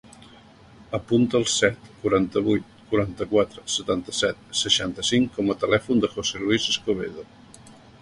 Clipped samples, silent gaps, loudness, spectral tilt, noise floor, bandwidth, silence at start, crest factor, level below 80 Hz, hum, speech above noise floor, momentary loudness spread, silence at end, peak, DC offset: under 0.1%; none; -23 LUFS; -3.5 dB/octave; -50 dBFS; 11.5 kHz; 0.8 s; 22 dB; -52 dBFS; none; 26 dB; 7 LU; 0.3 s; -2 dBFS; under 0.1%